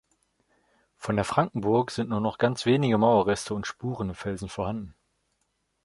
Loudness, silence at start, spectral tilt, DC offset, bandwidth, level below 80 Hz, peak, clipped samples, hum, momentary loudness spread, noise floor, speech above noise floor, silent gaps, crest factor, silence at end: -26 LUFS; 1 s; -6 dB/octave; under 0.1%; 11.5 kHz; -54 dBFS; -6 dBFS; under 0.1%; none; 12 LU; -75 dBFS; 50 dB; none; 20 dB; 0.95 s